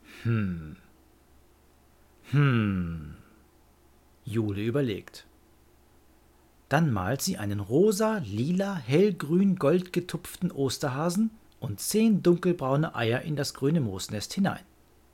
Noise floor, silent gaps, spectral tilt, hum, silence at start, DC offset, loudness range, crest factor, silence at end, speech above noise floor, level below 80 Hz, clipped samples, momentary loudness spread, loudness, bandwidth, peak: -60 dBFS; none; -6 dB/octave; none; 0.1 s; under 0.1%; 7 LU; 18 dB; 0.5 s; 33 dB; -58 dBFS; under 0.1%; 12 LU; -27 LUFS; 17 kHz; -10 dBFS